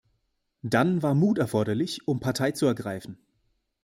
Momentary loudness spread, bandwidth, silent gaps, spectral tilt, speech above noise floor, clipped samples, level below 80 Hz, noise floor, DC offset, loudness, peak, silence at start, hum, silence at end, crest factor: 13 LU; 16.5 kHz; none; -6.5 dB/octave; 50 dB; under 0.1%; -62 dBFS; -75 dBFS; under 0.1%; -26 LUFS; -8 dBFS; 0.65 s; none; 0.7 s; 18 dB